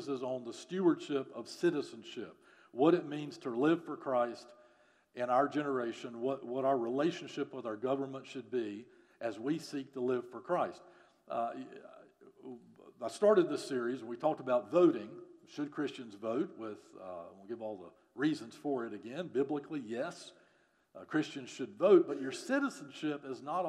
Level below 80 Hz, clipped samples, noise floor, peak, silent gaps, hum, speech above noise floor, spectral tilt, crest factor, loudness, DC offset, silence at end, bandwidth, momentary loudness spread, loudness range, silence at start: under -90 dBFS; under 0.1%; -71 dBFS; -14 dBFS; none; none; 36 dB; -6 dB/octave; 22 dB; -35 LUFS; under 0.1%; 0 s; 11.5 kHz; 19 LU; 7 LU; 0 s